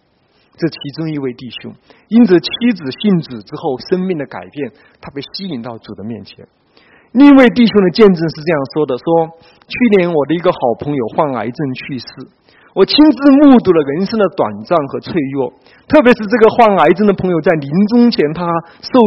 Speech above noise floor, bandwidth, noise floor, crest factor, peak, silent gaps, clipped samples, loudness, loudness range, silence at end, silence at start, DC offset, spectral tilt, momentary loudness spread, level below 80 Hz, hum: 43 dB; 6 kHz; -56 dBFS; 12 dB; 0 dBFS; none; 0.3%; -12 LUFS; 8 LU; 0 s; 0.6 s; under 0.1%; -8 dB/octave; 18 LU; -48 dBFS; none